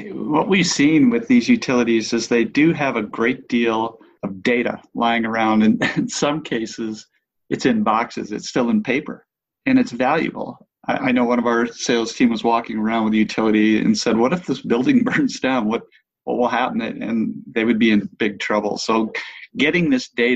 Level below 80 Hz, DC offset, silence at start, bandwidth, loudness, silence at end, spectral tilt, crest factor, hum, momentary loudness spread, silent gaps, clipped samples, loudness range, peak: -56 dBFS; under 0.1%; 0 s; 8.4 kHz; -19 LUFS; 0 s; -5 dB/octave; 16 dB; none; 10 LU; none; under 0.1%; 4 LU; -4 dBFS